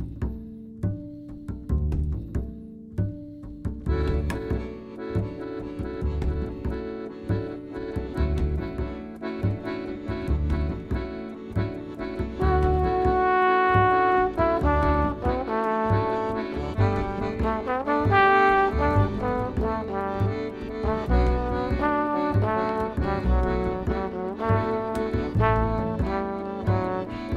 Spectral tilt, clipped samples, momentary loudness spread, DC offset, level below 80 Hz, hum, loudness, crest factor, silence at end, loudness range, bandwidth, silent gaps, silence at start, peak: -8.5 dB/octave; under 0.1%; 13 LU; under 0.1%; -32 dBFS; none; -26 LUFS; 18 dB; 0 s; 9 LU; 8.4 kHz; none; 0 s; -8 dBFS